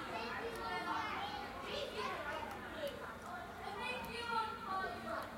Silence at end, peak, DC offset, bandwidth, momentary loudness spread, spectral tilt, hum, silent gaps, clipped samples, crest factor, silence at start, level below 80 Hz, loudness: 0 s; -26 dBFS; under 0.1%; 16 kHz; 7 LU; -4 dB/octave; none; none; under 0.1%; 16 dB; 0 s; -64 dBFS; -42 LUFS